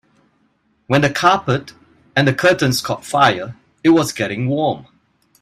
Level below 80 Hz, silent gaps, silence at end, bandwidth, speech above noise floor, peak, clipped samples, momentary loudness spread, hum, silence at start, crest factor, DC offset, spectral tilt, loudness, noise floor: -54 dBFS; none; 0.6 s; 15.5 kHz; 46 dB; 0 dBFS; under 0.1%; 8 LU; none; 0.9 s; 18 dB; under 0.1%; -5 dB/octave; -17 LUFS; -62 dBFS